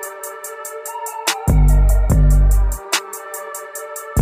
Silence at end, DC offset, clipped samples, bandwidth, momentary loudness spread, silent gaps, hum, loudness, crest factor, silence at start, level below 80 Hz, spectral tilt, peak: 0 s; under 0.1%; under 0.1%; 16 kHz; 14 LU; none; none; -19 LUFS; 14 dB; 0 s; -16 dBFS; -4.5 dB/octave; -2 dBFS